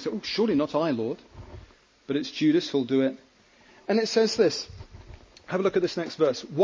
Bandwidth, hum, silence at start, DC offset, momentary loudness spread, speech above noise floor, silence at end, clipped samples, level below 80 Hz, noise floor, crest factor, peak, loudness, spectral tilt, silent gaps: 7.8 kHz; none; 0 s; under 0.1%; 22 LU; 32 dB; 0 s; under 0.1%; -56 dBFS; -57 dBFS; 16 dB; -10 dBFS; -26 LUFS; -5 dB/octave; none